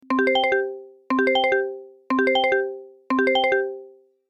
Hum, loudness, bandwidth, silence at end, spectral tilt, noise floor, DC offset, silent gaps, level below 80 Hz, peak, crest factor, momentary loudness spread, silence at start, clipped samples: none; -22 LUFS; 8.8 kHz; 0.4 s; -4 dB/octave; -47 dBFS; under 0.1%; none; -66 dBFS; -8 dBFS; 14 dB; 15 LU; 0.1 s; under 0.1%